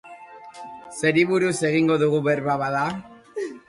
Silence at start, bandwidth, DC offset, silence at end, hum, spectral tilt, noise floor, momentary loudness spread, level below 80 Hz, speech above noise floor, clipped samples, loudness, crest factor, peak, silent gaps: 0.05 s; 11.5 kHz; under 0.1%; 0.1 s; none; -5.5 dB/octave; -43 dBFS; 21 LU; -62 dBFS; 22 dB; under 0.1%; -22 LUFS; 16 dB; -6 dBFS; none